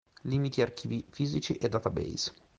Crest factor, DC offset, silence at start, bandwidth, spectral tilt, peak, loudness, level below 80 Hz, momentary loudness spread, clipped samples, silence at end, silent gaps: 20 dB; under 0.1%; 0.25 s; 8.8 kHz; -5.5 dB/octave; -12 dBFS; -32 LUFS; -56 dBFS; 5 LU; under 0.1%; 0.25 s; none